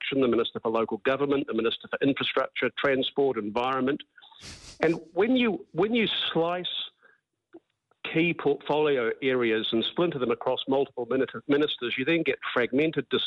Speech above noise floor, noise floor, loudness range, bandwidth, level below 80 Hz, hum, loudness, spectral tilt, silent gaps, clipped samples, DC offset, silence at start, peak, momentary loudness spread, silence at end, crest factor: 37 dB; -64 dBFS; 2 LU; 9.6 kHz; -64 dBFS; none; -27 LUFS; -6 dB/octave; none; under 0.1%; under 0.1%; 0 s; -8 dBFS; 5 LU; 0 s; 18 dB